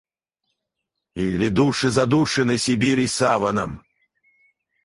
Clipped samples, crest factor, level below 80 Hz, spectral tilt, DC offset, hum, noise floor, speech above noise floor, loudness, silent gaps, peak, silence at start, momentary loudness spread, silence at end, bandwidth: under 0.1%; 18 dB; -48 dBFS; -5 dB/octave; under 0.1%; none; -81 dBFS; 61 dB; -20 LUFS; none; -4 dBFS; 1.15 s; 9 LU; 1.05 s; 11.5 kHz